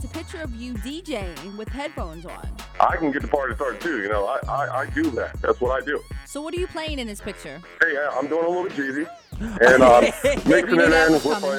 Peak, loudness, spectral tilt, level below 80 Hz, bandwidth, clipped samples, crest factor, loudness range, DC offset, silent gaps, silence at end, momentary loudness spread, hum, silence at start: -4 dBFS; -21 LUFS; -5 dB/octave; -38 dBFS; 17.5 kHz; under 0.1%; 18 dB; 9 LU; under 0.1%; none; 0 s; 18 LU; none; 0 s